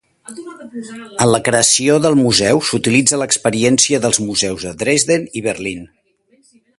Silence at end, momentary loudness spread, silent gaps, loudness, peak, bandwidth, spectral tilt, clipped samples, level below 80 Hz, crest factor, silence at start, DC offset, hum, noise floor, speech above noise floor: 0.9 s; 19 LU; none; -14 LUFS; 0 dBFS; 11.5 kHz; -3 dB/octave; under 0.1%; -48 dBFS; 16 dB; 0.3 s; under 0.1%; none; -56 dBFS; 41 dB